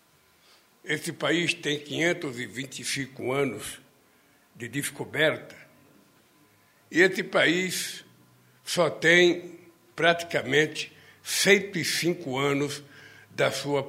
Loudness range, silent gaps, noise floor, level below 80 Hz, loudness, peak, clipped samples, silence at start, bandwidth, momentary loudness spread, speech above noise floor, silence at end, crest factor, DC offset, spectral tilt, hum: 7 LU; none; -61 dBFS; -70 dBFS; -25 LUFS; -4 dBFS; under 0.1%; 0.85 s; 16 kHz; 18 LU; 35 dB; 0 s; 24 dB; under 0.1%; -3.5 dB/octave; none